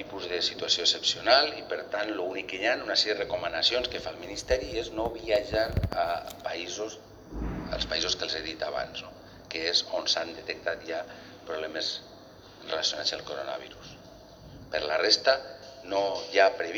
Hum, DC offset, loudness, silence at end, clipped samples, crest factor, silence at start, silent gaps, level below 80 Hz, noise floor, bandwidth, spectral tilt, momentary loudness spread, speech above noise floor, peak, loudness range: none; under 0.1%; -28 LUFS; 0 s; under 0.1%; 24 dB; 0 s; none; -48 dBFS; -50 dBFS; over 20 kHz; -2.5 dB/octave; 15 LU; 21 dB; -6 dBFS; 7 LU